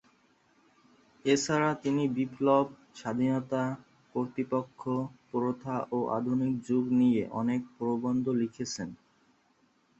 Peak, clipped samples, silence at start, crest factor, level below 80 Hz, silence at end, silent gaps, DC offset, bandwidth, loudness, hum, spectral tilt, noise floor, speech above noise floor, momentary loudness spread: -12 dBFS; under 0.1%; 1.25 s; 18 dB; -70 dBFS; 1.05 s; none; under 0.1%; 8 kHz; -30 LUFS; none; -6 dB/octave; -69 dBFS; 39 dB; 10 LU